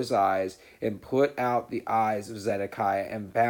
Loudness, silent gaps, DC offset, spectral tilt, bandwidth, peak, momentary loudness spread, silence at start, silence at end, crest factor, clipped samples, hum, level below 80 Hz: -28 LUFS; none; under 0.1%; -6 dB/octave; 19.5 kHz; -12 dBFS; 9 LU; 0 s; 0 s; 16 dB; under 0.1%; none; -66 dBFS